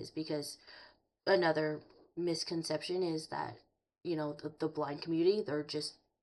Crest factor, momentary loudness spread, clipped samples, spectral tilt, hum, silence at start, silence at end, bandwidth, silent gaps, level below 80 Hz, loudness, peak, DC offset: 20 dB; 15 LU; under 0.1%; -5 dB/octave; none; 0 s; 0.3 s; 11.5 kHz; none; -78 dBFS; -36 LUFS; -18 dBFS; under 0.1%